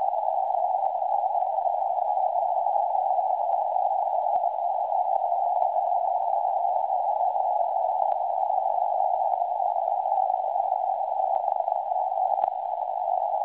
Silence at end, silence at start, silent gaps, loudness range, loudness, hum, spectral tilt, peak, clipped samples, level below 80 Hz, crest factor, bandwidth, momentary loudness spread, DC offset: 0 s; 0 s; none; 1 LU; -26 LUFS; none; -6 dB/octave; -8 dBFS; under 0.1%; -78 dBFS; 16 dB; 4 kHz; 2 LU; under 0.1%